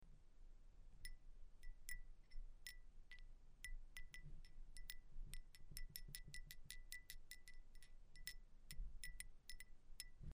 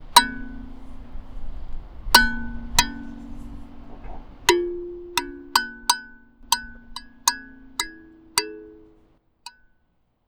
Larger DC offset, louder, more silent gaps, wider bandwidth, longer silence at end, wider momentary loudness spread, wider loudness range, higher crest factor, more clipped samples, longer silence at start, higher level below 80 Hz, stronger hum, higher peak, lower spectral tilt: neither; second, -60 LUFS vs -23 LUFS; neither; second, 15.5 kHz vs over 20 kHz; second, 0 s vs 0.8 s; second, 10 LU vs 26 LU; about the same, 3 LU vs 5 LU; about the same, 24 dB vs 26 dB; neither; about the same, 0 s vs 0 s; second, -58 dBFS vs -38 dBFS; neither; second, -30 dBFS vs 0 dBFS; about the same, -1.5 dB/octave vs -1 dB/octave